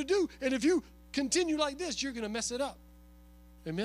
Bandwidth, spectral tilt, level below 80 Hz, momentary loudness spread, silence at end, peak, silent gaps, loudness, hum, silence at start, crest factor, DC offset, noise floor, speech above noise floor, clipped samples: 15.5 kHz; -3 dB/octave; -56 dBFS; 9 LU; 0 s; -16 dBFS; none; -32 LUFS; 60 Hz at -55 dBFS; 0 s; 16 dB; under 0.1%; -56 dBFS; 24 dB; under 0.1%